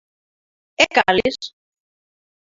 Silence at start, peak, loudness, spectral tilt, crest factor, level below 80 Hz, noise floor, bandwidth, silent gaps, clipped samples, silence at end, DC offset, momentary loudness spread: 0.8 s; 0 dBFS; -17 LUFS; -2.5 dB/octave; 22 dB; -54 dBFS; under -90 dBFS; 7.8 kHz; none; under 0.1%; 0.95 s; under 0.1%; 20 LU